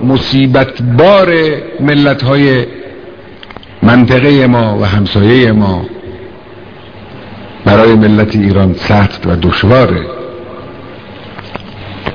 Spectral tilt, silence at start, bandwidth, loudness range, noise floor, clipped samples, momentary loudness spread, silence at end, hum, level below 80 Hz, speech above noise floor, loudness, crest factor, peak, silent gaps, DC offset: -8.5 dB/octave; 0 s; 5.4 kHz; 3 LU; -31 dBFS; 1%; 23 LU; 0 s; none; -32 dBFS; 24 dB; -8 LUFS; 10 dB; 0 dBFS; none; 1%